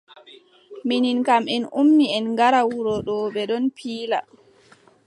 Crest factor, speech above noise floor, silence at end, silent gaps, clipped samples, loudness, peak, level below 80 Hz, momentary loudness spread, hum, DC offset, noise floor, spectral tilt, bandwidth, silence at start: 16 dB; 34 dB; 0.85 s; none; under 0.1%; -21 LUFS; -6 dBFS; -62 dBFS; 9 LU; none; under 0.1%; -54 dBFS; -5 dB/octave; 11 kHz; 0.3 s